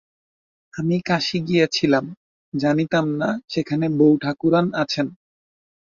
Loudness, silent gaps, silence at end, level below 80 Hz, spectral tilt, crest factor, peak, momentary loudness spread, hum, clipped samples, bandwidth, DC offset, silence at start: -21 LUFS; 2.17-2.52 s; 0.8 s; -60 dBFS; -6 dB/octave; 18 dB; -4 dBFS; 9 LU; none; under 0.1%; 7.4 kHz; under 0.1%; 0.75 s